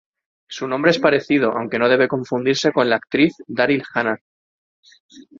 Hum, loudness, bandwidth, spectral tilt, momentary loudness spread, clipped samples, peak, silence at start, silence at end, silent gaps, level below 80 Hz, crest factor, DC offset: none; -18 LUFS; 7.6 kHz; -5 dB/octave; 8 LU; under 0.1%; -2 dBFS; 0.5 s; 0.2 s; 4.21-4.83 s, 5.00-5.09 s; -62 dBFS; 18 dB; under 0.1%